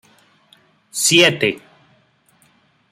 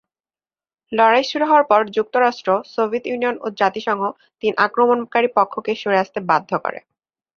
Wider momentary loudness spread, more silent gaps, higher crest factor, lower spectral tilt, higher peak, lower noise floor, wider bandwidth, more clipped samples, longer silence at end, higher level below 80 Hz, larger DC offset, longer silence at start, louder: first, 18 LU vs 9 LU; neither; about the same, 20 dB vs 18 dB; second, -2.5 dB/octave vs -5 dB/octave; about the same, 0 dBFS vs -2 dBFS; second, -58 dBFS vs under -90 dBFS; first, 16 kHz vs 7 kHz; neither; first, 1.35 s vs 0.6 s; about the same, -66 dBFS vs -68 dBFS; neither; about the same, 0.95 s vs 0.9 s; first, -14 LUFS vs -19 LUFS